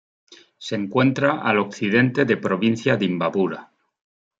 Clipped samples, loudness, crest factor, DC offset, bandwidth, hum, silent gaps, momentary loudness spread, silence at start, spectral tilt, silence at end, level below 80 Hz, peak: under 0.1%; -21 LUFS; 20 dB; under 0.1%; 7.8 kHz; none; none; 9 LU; 0.3 s; -6.5 dB/octave; 0.75 s; -66 dBFS; -2 dBFS